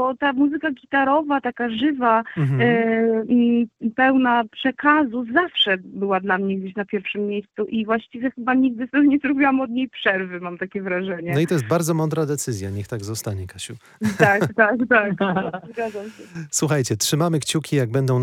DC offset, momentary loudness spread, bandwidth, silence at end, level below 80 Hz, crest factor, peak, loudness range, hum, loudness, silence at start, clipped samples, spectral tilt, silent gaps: under 0.1%; 11 LU; 17 kHz; 0 s; -60 dBFS; 20 dB; -2 dBFS; 4 LU; none; -21 LUFS; 0 s; under 0.1%; -5 dB/octave; none